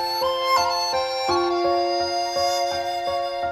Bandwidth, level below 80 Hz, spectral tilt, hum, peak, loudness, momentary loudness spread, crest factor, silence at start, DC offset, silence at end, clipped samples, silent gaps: 15.5 kHz; -56 dBFS; -2.5 dB/octave; none; -8 dBFS; -22 LUFS; 5 LU; 14 dB; 0 s; under 0.1%; 0 s; under 0.1%; none